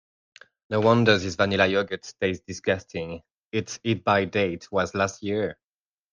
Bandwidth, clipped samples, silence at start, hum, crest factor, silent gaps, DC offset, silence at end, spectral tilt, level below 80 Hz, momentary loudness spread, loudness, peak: 10 kHz; under 0.1%; 0.7 s; none; 20 dB; 3.38-3.51 s; under 0.1%; 0.6 s; -5 dB/octave; -62 dBFS; 12 LU; -25 LUFS; -4 dBFS